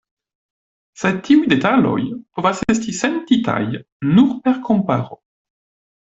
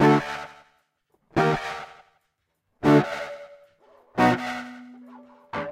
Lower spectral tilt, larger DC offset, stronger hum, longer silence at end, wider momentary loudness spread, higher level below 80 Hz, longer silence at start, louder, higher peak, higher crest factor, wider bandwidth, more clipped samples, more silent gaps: about the same, -6 dB/octave vs -6.5 dB/octave; neither; neither; first, 0.95 s vs 0 s; second, 9 LU vs 23 LU; about the same, -52 dBFS vs -56 dBFS; first, 1 s vs 0 s; first, -17 LUFS vs -24 LUFS; first, -2 dBFS vs -8 dBFS; about the same, 16 dB vs 18 dB; second, 8 kHz vs 14.5 kHz; neither; first, 3.92-4.00 s vs none